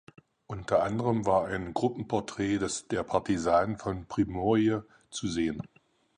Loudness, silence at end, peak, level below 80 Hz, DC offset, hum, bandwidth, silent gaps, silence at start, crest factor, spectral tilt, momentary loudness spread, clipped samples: -29 LUFS; 0.5 s; -10 dBFS; -54 dBFS; under 0.1%; none; 10.5 kHz; none; 0.5 s; 18 dB; -6 dB/octave; 10 LU; under 0.1%